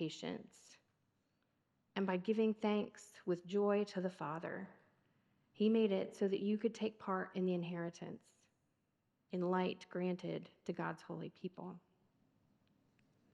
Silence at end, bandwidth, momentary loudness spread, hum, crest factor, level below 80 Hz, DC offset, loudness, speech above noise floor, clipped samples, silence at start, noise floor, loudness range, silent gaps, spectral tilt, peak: 1.55 s; 11.5 kHz; 14 LU; none; 20 dB; under -90 dBFS; under 0.1%; -40 LUFS; 44 dB; under 0.1%; 0 s; -83 dBFS; 5 LU; none; -7 dB/octave; -22 dBFS